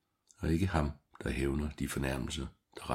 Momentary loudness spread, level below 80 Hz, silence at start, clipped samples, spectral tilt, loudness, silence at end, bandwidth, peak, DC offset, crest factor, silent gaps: 10 LU; -44 dBFS; 0.4 s; under 0.1%; -6 dB/octave; -36 LUFS; 0 s; 16 kHz; -14 dBFS; under 0.1%; 22 dB; none